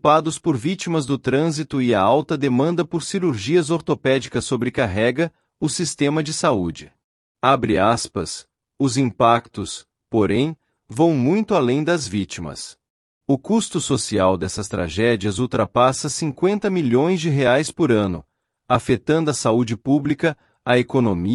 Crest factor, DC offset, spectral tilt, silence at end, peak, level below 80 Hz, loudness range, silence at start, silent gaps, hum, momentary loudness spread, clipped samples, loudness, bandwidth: 16 dB; under 0.1%; -5.5 dB/octave; 0 s; -4 dBFS; -52 dBFS; 2 LU; 0.05 s; 7.04-7.35 s, 12.90-13.21 s; none; 9 LU; under 0.1%; -20 LUFS; 12 kHz